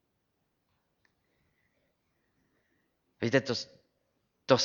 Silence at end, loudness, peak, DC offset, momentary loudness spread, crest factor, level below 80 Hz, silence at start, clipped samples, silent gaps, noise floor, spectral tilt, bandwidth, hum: 0 s; -31 LUFS; -8 dBFS; under 0.1%; 18 LU; 28 dB; -78 dBFS; 3.2 s; under 0.1%; none; -79 dBFS; -4.5 dB/octave; 7.6 kHz; none